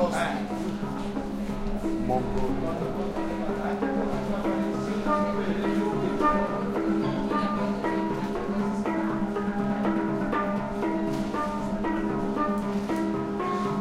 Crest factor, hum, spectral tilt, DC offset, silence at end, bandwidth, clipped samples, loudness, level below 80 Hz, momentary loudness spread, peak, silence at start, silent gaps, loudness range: 16 dB; none; -7 dB/octave; under 0.1%; 0 s; 13 kHz; under 0.1%; -28 LUFS; -42 dBFS; 4 LU; -12 dBFS; 0 s; none; 3 LU